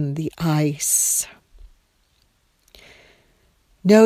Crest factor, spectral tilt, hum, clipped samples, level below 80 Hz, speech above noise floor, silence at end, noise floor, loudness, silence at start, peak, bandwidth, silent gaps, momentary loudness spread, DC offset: 20 dB; -4.5 dB/octave; none; under 0.1%; -54 dBFS; 42 dB; 0 s; -63 dBFS; -20 LUFS; 0 s; -2 dBFS; 17 kHz; none; 10 LU; under 0.1%